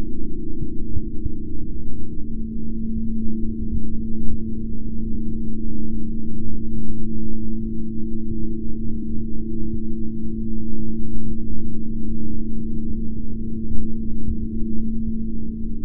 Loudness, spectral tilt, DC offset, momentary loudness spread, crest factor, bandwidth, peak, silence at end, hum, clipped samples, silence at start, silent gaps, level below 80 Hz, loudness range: -29 LUFS; -17 dB/octave; under 0.1%; 4 LU; 12 dB; 0.5 kHz; -2 dBFS; 0 s; none; under 0.1%; 0 s; none; -28 dBFS; 1 LU